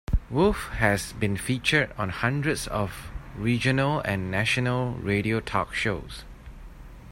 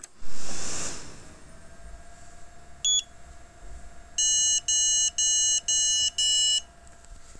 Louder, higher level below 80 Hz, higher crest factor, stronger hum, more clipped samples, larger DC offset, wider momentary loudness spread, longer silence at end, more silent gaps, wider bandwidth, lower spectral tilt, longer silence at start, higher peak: second, -26 LUFS vs -22 LUFS; first, -38 dBFS vs -50 dBFS; first, 20 dB vs 12 dB; neither; neither; neither; second, 11 LU vs 15 LU; about the same, 0 s vs 0 s; neither; first, 16 kHz vs 11 kHz; first, -5.5 dB/octave vs 1.5 dB/octave; about the same, 0.1 s vs 0 s; first, -6 dBFS vs -14 dBFS